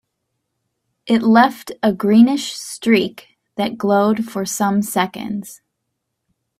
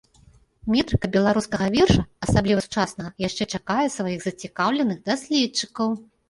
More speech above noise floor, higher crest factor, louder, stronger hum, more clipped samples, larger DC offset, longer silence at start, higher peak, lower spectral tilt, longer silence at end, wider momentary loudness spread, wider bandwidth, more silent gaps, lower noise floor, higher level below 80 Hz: first, 59 dB vs 33 dB; about the same, 18 dB vs 20 dB; first, -17 LUFS vs -23 LUFS; neither; neither; neither; first, 1.05 s vs 0.65 s; first, 0 dBFS vs -4 dBFS; about the same, -5 dB/octave vs -5 dB/octave; first, 1.05 s vs 0.25 s; first, 14 LU vs 8 LU; first, 15.5 kHz vs 11.5 kHz; neither; first, -75 dBFS vs -55 dBFS; second, -60 dBFS vs -40 dBFS